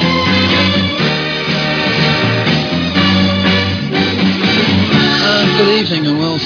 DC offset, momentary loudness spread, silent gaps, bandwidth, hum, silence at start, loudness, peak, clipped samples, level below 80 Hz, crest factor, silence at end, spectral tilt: under 0.1%; 4 LU; none; 5.4 kHz; none; 0 s; -12 LUFS; 0 dBFS; under 0.1%; -42 dBFS; 12 dB; 0 s; -5.5 dB/octave